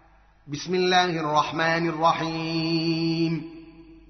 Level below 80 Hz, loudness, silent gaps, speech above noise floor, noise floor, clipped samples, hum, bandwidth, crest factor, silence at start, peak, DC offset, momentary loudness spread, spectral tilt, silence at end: -58 dBFS; -24 LUFS; none; 23 dB; -47 dBFS; under 0.1%; none; 6.4 kHz; 18 dB; 0.45 s; -8 dBFS; under 0.1%; 11 LU; -3.5 dB/octave; 0.1 s